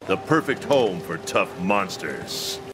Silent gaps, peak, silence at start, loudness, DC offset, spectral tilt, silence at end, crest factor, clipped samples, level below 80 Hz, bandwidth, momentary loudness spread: none; -4 dBFS; 0 s; -24 LUFS; under 0.1%; -4.5 dB/octave; 0 s; 20 dB; under 0.1%; -60 dBFS; 16 kHz; 8 LU